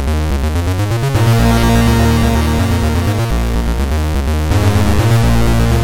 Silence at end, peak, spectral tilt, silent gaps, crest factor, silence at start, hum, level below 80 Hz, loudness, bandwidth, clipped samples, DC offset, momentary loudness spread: 0 s; -2 dBFS; -6 dB/octave; none; 10 dB; 0 s; none; -18 dBFS; -14 LUFS; 17 kHz; under 0.1%; under 0.1%; 5 LU